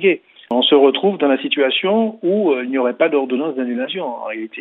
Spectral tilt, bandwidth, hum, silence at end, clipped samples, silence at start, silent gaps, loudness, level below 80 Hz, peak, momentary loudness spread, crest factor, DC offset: -8 dB/octave; 4.1 kHz; none; 0 s; under 0.1%; 0 s; none; -17 LUFS; -78 dBFS; -2 dBFS; 11 LU; 16 dB; under 0.1%